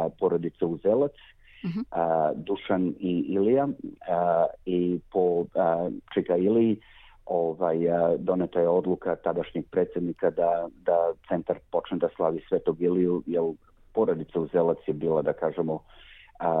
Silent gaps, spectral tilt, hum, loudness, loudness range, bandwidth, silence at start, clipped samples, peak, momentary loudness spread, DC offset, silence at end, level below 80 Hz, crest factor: none; -10.5 dB/octave; none; -27 LUFS; 2 LU; 4.6 kHz; 0 s; under 0.1%; -12 dBFS; 7 LU; under 0.1%; 0 s; -60 dBFS; 14 dB